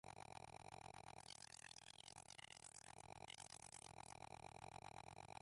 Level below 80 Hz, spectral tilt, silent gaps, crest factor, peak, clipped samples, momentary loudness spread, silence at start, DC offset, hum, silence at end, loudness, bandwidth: -78 dBFS; -2.5 dB/octave; none; 18 dB; -42 dBFS; under 0.1%; 2 LU; 0.05 s; under 0.1%; none; 0 s; -59 LUFS; 11.5 kHz